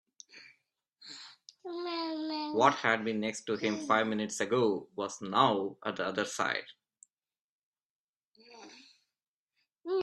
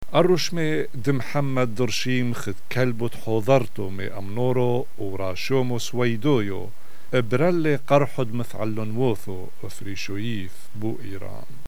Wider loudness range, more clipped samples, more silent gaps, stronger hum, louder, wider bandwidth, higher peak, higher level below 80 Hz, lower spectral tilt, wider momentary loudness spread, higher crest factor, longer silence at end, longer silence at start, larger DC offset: first, 8 LU vs 3 LU; neither; first, 7.41-7.73 s, 7.85-8.32 s, 9.28-9.46 s vs none; neither; second, -31 LUFS vs -25 LUFS; second, 12.5 kHz vs over 20 kHz; second, -10 dBFS vs -4 dBFS; second, -78 dBFS vs -58 dBFS; second, -4 dB/octave vs -6 dB/octave; first, 24 LU vs 14 LU; about the same, 24 dB vs 22 dB; about the same, 0 s vs 0.05 s; first, 0.35 s vs 0.1 s; second, under 0.1% vs 7%